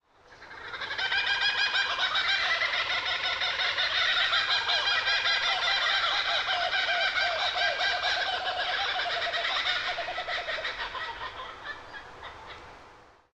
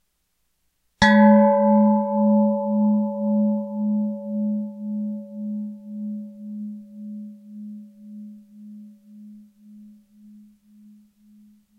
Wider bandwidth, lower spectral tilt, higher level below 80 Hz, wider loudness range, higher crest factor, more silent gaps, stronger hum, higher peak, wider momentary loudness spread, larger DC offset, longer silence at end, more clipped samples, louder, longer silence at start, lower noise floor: first, 10 kHz vs 8 kHz; second, 0 dB/octave vs -7.5 dB/octave; second, -60 dBFS vs -54 dBFS; second, 7 LU vs 23 LU; about the same, 18 dB vs 20 dB; neither; neither; second, -12 dBFS vs -2 dBFS; second, 16 LU vs 25 LU; neither; second, 0.35 s vs 1.9 s; neither; second, -26 LUFS vs -20 LUFS; second, 0.3 s vs 1 s; second, -54 dBFS vs -72 dBFS